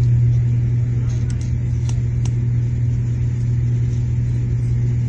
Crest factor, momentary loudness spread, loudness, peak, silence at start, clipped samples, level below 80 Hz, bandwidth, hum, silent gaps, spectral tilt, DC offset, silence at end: 10 dB; 4 LU; -19 LUFS; -8 dBFS; 0 s; under 0.1%; -28 dBFS; 7.6 kHz; none; none; -8.5 dB/octave; under 0.1%; 0 s